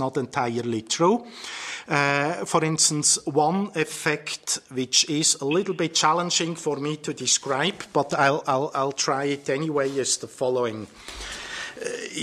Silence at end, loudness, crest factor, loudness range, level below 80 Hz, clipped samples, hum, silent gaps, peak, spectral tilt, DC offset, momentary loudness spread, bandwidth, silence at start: 0 s; -23 LUFS; 20 dB; 4 LU; -58 dBFS; under 0.1%; none; none; -4 dBFS; -2.5 dB/octave; under 0.1%; 12 LU; 15.5 kHz; 0 s